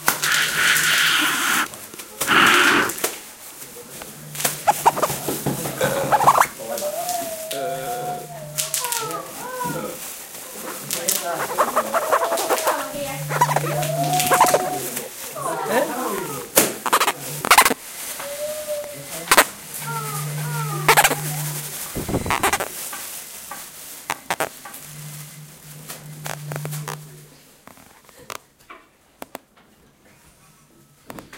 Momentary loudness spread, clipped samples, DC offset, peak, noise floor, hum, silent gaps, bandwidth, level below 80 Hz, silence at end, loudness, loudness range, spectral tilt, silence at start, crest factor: 20 LU; under 0.1%; under 0.1%; 0 dBFS; -54 dBFS; none; none; 17 kHz; -52 dBFS; 0 s; -20 LUFS; 14 LU; -2 dB/octave; 0 s; 22 dB